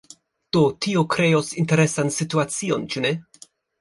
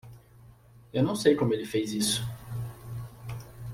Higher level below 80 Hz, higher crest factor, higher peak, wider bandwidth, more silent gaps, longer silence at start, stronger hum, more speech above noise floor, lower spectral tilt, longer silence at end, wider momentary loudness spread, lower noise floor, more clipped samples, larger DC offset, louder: about the same, -60 dBFS vs -56 dBFS; second, 16 dB vs 22 dB; about the same, -6 dBFS vs -8 dBFS; second, 11.5 kHz vs 16.5 kHz; neither; first, 0.55 s vs 0.05 s; neither; about the same, 30 dB vs 28 dB; about the same, -5 dB/octave vs -5 dB/octave; first, 0.6 s vs 0 s; second, 6 LU vs 17 LU; about the same, -51 dBFS vs -54 dBFS; neither; neither; first, -21 LUFS vs -28 LUFS